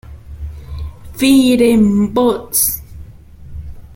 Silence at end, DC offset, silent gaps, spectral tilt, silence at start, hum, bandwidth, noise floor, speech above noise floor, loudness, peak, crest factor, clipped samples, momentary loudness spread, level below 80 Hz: 0 s; under 0.1%; none; -4.5 dB/octave; 0.1 s; none; 17 kHz; -36 dBFS; 24 dB; -12 LUFS; 0 dBFS; 14 dB; under 0.1%; 22 LU; -34 dBFS